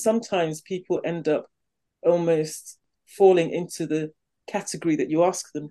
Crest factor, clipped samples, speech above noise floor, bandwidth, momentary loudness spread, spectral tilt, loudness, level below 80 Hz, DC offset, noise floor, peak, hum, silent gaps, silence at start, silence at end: 20 dB; under 0.1%; 31 dB; 12.5 kHz; 13 LU; -5.5 dB/octave; -24 LUFS; -74 dBFS; under 0.1%; -55 dBFS; -6 dBFS; none; none; 0 s; 0 s